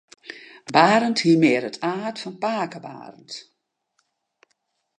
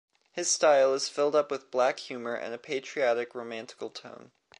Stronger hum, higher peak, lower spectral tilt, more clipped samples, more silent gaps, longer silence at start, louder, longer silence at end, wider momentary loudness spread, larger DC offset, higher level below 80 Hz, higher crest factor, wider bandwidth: neither; first, -2 dBFS vs -10 dBFS; first, -5 dB/octave vs -1.5 dB/octave; neither; neither; about the same, 0.3 s vs 0.35 s; first, -20 LUFS vs -28 LUFS; first, 1.6 s vs 0.45 s; first, 23 LU vs 18 LU; neither; first, -76 dBFS vs -84 dBFS; about the same, 22 dB vs 18 dB; second, 9.8 kHz vs 11.5 kHz